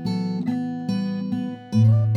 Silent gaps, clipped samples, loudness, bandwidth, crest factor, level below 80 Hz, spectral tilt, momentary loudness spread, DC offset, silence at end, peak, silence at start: none; under 0.1%; -24 LUFS; 6.4 kHz; 14 dB; -62 dBFS; -9 dB/octave; 9 LU; under 0.1%; 0 s; -8 dBFS; 0 s